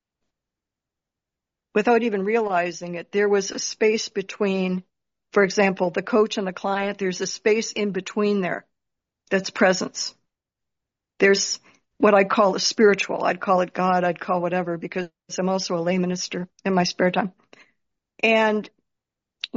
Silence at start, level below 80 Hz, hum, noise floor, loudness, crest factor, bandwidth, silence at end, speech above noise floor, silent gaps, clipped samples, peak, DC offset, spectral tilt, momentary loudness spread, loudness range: 1.75 s; -68 dBFS; none; -87 dBFS; -22 LUFS; 18 dB; 7.6 kHz; 0 s; 65 dB; none; under 0.1%; -4 dBFS; under 0.1%; -3.5 dB/octave; 10 LU; 5 LU